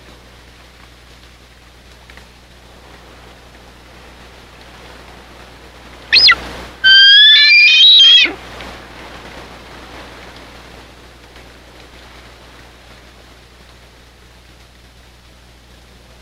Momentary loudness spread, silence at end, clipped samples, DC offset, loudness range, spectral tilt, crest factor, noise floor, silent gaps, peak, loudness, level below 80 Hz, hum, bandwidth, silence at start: 29 LU; 7.5 s; under 0.1%; under 0.1%; 9 LU; 0 dB/octave; 16 dB; -43 dBFS; none; 0 dBFS; -5 LUFS; -44 dBFS; 60 Hz at -45 dBFS; 15 kHz; 6.1 s